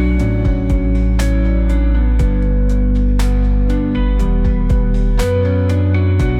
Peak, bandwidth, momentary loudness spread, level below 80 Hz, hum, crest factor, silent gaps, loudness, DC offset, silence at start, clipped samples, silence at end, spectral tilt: -4 dBFS; 10.5 kHz; 2 LU; -14 dBFS; none; 8 dB; none; -16 LUFS; under 0.1%; 0 s; under 0.1%; 0 s; -8 dB/octave